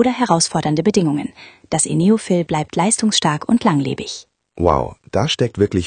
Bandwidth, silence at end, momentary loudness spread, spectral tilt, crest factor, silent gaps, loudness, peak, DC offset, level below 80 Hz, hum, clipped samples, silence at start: 10 kHz; 0 s; 8 LU; -4.5 dB/octave; 18 dB; none; -17 LUFS; 0 dBFS; under 0.1%; -44 dBFS; none; under 0.1%; 0 s